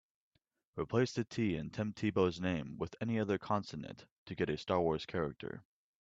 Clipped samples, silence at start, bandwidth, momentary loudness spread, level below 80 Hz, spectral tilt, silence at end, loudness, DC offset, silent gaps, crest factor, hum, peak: under 0.1%; 0.75 s; 7.8 kHz; 14 LU; -64 dBFS; -6.5 dB/octave; 0.4 s; -36 LUFS; under 0.1%; 4.11-4.26 s; 20 dB; none; -16 dBFS